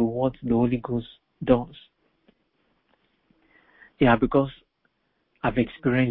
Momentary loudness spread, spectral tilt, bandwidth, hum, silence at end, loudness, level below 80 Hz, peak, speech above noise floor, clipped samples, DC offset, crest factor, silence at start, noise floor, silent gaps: 11 LU; -11.5 dB/octave; 4.2 kHz; none; 0 s; -24 LUFS; -48 dBFS; -6 dBFS; 49 dB; under 0.1%; under 0.1%; 20 dB; 0 s; -72 dBFS; none